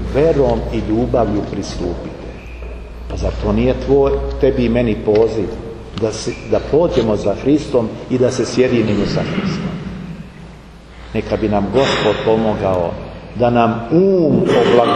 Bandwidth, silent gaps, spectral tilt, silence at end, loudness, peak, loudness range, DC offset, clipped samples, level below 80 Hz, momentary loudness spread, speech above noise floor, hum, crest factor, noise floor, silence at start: 10.5 kHz; none; -6.5 dB/octave; 0 s; -16 LUFS; 0 dBFS; 4 LU; under 0.1%; under 0.1%; -30 dBFS; 16 LU; 22 dB; none; 16 dB; -37 dBFS; 0 s